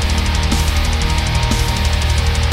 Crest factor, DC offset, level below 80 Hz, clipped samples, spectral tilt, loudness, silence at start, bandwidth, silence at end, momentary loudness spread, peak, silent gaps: 12 dB; under 0.1%; -18 dBFS; under 0.1%; -4 dB/octave; -16 LUFS; 0 s; 16 kHz; 0 s; 1 LU; -2 dBFS; none